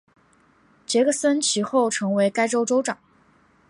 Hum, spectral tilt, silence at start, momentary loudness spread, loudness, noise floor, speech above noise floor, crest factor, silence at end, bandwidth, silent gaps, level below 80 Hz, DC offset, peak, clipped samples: none; -3.5 dB/octave; 0.9 s; 8 LU; -21 LUFS; -59 dBFS; 38 dB; 16 dB; 0.75 s; 11.5 kHz; none; -74 dBFS; under 0.1%; -8 dBFS; under 0.1%